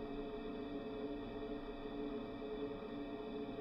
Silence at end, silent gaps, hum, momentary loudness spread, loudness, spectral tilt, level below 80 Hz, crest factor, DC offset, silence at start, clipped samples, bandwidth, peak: 0 s; none; none; 2 LU; -46 LUFS; -8 dB/octave; -58 dBFS; 12 dB; under 0.1%; 0 s; under 0.1%; 6 kHz; -32 dBFS